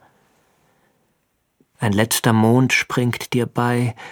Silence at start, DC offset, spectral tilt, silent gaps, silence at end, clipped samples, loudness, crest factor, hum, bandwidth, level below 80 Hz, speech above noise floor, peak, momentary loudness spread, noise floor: 1.8 s; under 0.1%; -5 dB/octave; none; 0 s; under 0.1%; -18 LUFS; 20 dB; none; 19 kHz; -60 dBFS; 50 dB; -2 dBFS; 7 LU; -68 dBFS